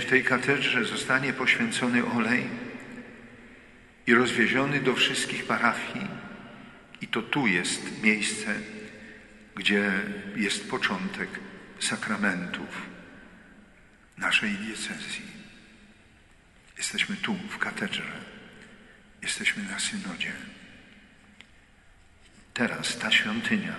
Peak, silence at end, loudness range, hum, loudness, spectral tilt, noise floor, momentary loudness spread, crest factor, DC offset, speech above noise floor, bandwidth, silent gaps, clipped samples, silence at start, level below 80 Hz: -6 dBFS; 0 s; 7 LU; none; -27 LUFS; -3 dB/octave; -57 dBFS; 21 LU; 24 dB; under 0.1%; 29 dB; 11.5 kHz; none; under 0.1%; 0 s; -62 dBFS